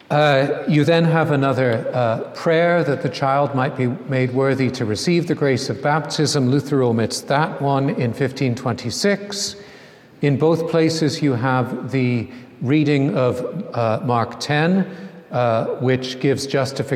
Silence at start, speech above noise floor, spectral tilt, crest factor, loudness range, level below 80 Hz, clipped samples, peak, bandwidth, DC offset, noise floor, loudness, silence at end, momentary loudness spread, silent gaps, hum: 0.1 s; 25 dB; -6 dB/octave; 16 dB; 3 LU; -60 dBFS; under 0.1%; -2 dBFS; 14 kHz; under 0.1%; -44 dBFS; -19 LUFS; 0 s; 7 LU; none; none